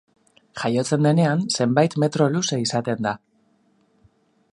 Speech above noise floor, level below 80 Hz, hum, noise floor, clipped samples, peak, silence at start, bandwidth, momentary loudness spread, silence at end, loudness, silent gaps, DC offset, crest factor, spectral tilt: 42 dB; -64 dBFS; none; -62 dBFS; under 0.1%; -2 dBFS; 0.55 s; 11 kHz; 9 LU; 1.35 s; -21 LUFS; none; under 0.1%; 20 dB; -5.5 dB/octave